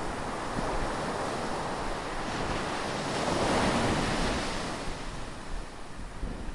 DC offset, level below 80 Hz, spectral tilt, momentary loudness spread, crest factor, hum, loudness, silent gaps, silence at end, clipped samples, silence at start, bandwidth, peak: under 0.1%; -40 dBFS; -4.5 dB/octave; 14 LU; 16 dB; none; -32 LUFS; none; 0 s; under 0.1%; 0 s; 11.5 kHz; -14 dBFS